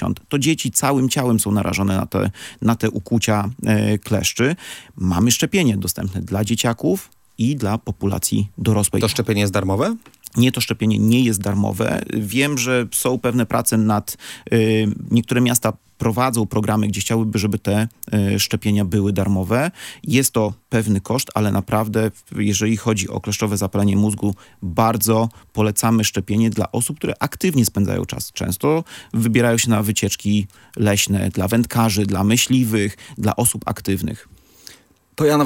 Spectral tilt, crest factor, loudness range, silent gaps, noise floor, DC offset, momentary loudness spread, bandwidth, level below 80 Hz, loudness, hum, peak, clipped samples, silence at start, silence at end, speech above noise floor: -5 dB/octave; 18 dB; 2 LU; none; -45 dBFS; under 0.1%; 7 LU; 17 kHz; -50 dBFS; -19 LUFS; none; 0 dBFS; under 0.1%; 0 s; 0 s; 27 dB